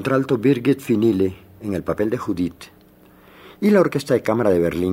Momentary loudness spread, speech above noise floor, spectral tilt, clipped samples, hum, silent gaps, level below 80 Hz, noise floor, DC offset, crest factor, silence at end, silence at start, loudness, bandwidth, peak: 9 LU; 31 dB; -7.5 dB/octave; under 0.1%; none; none; -54 dBFS; -50 dBFS; under 0.1%; 16 dB; 0 s; 0 s; -20 LUFS; 16 kHz; -4 dBFS